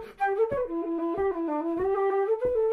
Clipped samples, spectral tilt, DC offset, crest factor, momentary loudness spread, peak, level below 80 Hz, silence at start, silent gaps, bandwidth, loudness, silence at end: under 0.1%; -8 dB/octave; under 0.1%; 12 dB; 4 LU; -16 dBFS; -54 dBFS; 0 s; none; 4.7 kHz; -28 LUFS; 0 s